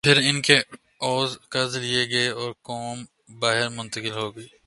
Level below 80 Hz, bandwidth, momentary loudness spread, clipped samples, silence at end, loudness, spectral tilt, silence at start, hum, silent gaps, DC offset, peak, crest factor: -62 dBFS; 11.5 kHz; 15 LU; under 0.1%; 0.2 s; -23 LUFS; -3 dB/octave; 0.05 s; none; none; under 0.1%; 0 dBFS; 24 dB